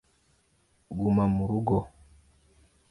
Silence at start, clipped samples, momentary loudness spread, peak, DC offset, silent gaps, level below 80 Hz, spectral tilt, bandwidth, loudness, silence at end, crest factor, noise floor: 0.9 s; under 0.1%; 14 LU; -12 dBFS; under 0.1%; none; -50 dBFS; -10.5 dB/octave; 11 kHz; -27 LUFS; 1 s; 18 dB; -68 dBFS